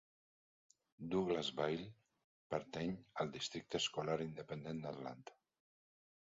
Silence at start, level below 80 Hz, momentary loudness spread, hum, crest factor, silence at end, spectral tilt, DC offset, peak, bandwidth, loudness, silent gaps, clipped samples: 1 s; -74 dBFS; 12 LU; none; 20 dB; 1 s; -4 dB/octave; under 0.1%; -24 dBFS; 7.4 kHz; -43 LUFS; 2.24-2.50 s; under 0.1%